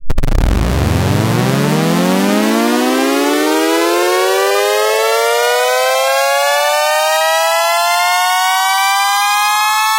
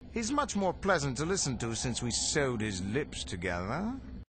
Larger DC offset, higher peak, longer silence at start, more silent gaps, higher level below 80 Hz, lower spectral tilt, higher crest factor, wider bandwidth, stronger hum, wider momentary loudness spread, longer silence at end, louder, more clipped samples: neither; first, -2 dBFS vs -12 dBFS; about the same, 0 s vs 0 s; neither; first, -24 dBFS vs -48 dBFS; about the same, -4 dB/octave vs -4 dB/octave; second, 10 dB vs 20 dB; first, 17 kHz vs 9.2 kHz; neither; second, 2 LU vs 7 LU; about the same, 0 s vs 0.05 s; first, -12 LUFS vs -32 LUFS; neither